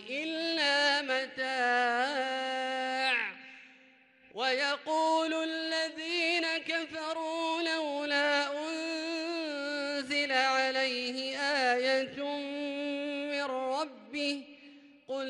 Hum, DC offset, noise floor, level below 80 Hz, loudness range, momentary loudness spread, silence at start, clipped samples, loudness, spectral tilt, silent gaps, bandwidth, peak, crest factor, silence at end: none; under 0.1%; -61 dBFS; -82 dBFS; 2 LU; 8 LU; 0 s; under 0.1%; -31 LUFS; -1 dB/octave; none; 11.5 kHz; -16 dBFS; 18 dB; 0 s